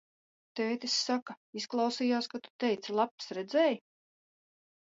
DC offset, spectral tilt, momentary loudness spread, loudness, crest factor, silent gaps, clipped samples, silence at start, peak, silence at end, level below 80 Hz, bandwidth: under 0.1%; -3 dB/octave; 11 LU; -32 LUFS; 18 dB; 1.22-1.26 s, 1.37-1.53 s, 2.50-2.59 s, 3.11-3.18 s; under 0.1%; 0.55 s; -16 dBFS; 1.1 s; -86 dBFS; 8 kHz